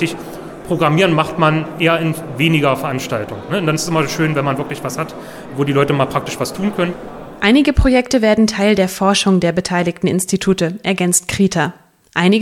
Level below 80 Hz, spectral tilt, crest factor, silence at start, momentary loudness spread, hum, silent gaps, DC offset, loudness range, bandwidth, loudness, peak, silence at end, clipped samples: -32 dBFS; -5 dB/octave; 16 dB; 0 s; 10 LU; none; none; under 0.1%; 4 LU; 16.5 kHz; -16 LUFS; 0 dBFS; 0 s; under 0.1%